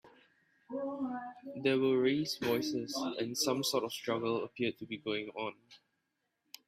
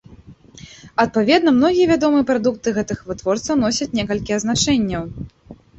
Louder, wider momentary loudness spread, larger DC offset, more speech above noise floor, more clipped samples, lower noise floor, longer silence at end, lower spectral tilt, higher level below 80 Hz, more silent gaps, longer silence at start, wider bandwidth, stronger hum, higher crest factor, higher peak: second, -35 LUFS vs -18 LUFS; about the same, 12 LU vs 11 LU; neither; first, 49 dB vs 26 dB; neither; first, -83 dBFS vs -44 dBFS; first, 0.9 s vs 0.25 s; about the same, -4 dB/octave vs -4.5 dB/octave; second, -76 dBFS vs -44 dBFS; neither; about the same, 0.05 s vs 0.1 s; first, 16 kHz vs 8.2 kHz; neither; about the same, 18 dB vs 16 dB; second, -18 dBFS vs -2 dBFS